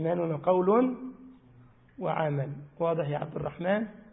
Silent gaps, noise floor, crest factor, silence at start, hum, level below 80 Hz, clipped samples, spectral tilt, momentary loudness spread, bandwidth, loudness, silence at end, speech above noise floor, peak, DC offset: none; -57 dBFS; 18 dB; 0 s; none; -64 dBFS; under 0.1%; -11.5 dB/octave; 12 LU; 3.9 kHz; -29 LUFS; 0.1 s; 28 dB; -12 dBFS; under 0.1%